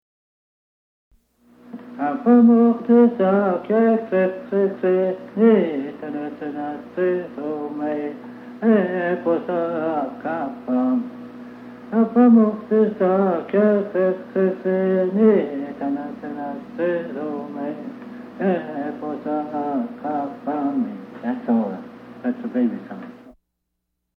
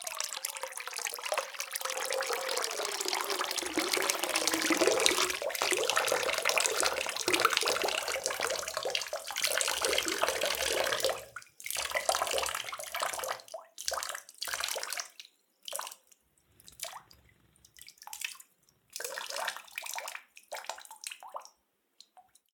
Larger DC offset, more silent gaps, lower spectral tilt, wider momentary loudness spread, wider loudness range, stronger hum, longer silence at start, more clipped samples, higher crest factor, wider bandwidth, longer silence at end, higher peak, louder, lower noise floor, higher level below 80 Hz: neither; neither; first, -10 dB/octave vs 0 dB/octave; about the same, 16 LU vs 16 LU; second, 9 LU vs 13 LU; first, 60 Hz at -55 dBFS vs none; first, 1.65 s vs 0 s; neither; second, 16 dB vs 34 dB; second, 4.3 kHz vs 19 kHz; first, 0.85 s vs 0.35 s; second, -4 dBFS vs 0 dBFS; first, -21 LUFS vs -31 LUFS; about the same, -77 dBFS vs -74 dBFS; about the same, -68 dBFS vs -68 dBFS